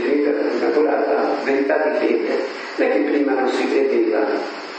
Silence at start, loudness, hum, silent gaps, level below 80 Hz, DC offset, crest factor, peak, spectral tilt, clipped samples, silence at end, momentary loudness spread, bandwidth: 0 s; -19 LUFS; none; none; -80 dBFS; under 0.1%; 14 dB; -4 dBFS; -4.5 dB/octave; under 0.1%; 0 s; 4 LU; 8.6 kHz